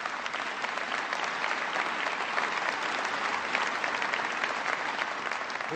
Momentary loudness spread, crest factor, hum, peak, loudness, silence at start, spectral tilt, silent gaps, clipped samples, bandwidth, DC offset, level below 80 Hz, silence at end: 4 LU; 20 dB; none; -10 dBFS; -30 LUFS; 0 s; -1.5 dB/octave; none; under 0.1%; 13.5 kHz; under 0.1%; -76 dBFS; 0 s